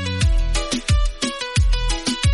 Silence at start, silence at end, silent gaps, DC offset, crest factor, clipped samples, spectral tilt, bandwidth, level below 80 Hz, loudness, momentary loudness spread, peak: 0 s; 0 s; none; under 0.1%; 10 dB; under 0.1%; -4 dB/octave; 11.5 kHz; -20 dBFS; -21 LUFS; 2 LU; -8 dBFS